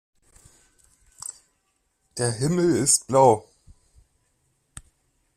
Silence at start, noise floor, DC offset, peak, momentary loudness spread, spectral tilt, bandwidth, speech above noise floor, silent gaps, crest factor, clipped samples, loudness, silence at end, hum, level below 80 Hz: 1.3 s; -72 dBFS; under 0.1%; -4 dBFS; 19 LU; -4.5 dB/octave; 14.5 kHz; 52 dB; none; 22 dB; under 0.1%; -20 LUFS; 1.95 s; none; -58 dBFS